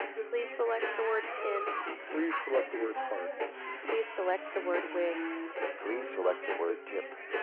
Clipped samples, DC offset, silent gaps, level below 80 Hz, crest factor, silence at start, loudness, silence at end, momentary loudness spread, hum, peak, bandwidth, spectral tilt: under 0.1%; under 0.1%; none; under -90 dBFS; 16 dB; 0 s; -34 LUFS; 0 s; 6 LU; none; -18 dBFS; 4.2 kHz; 1.5 dB/octave